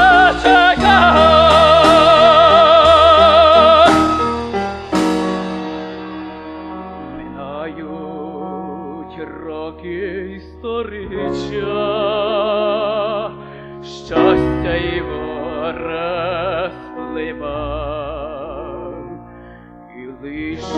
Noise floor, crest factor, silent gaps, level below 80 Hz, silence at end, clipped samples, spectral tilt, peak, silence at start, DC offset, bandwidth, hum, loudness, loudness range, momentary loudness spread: -38 dBFS; 14 dB; none; -34 dBFS; 0 s; under 0.1%; -5 dB/octave; 0 dBFS; 0 s; under 0.1%; 11.5 kHz; none; -13 LUFS; 19 LU; 22 LU